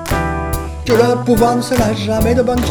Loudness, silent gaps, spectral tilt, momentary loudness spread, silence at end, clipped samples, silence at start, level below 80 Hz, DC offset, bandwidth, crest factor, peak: -15 LUFS; none; -6 dB/octave; 7 LU; 0 s; under 0.1%; 0 s; -26 dBFS; under 0.1%; over 20 kHz; 14 dB; 0 dBFS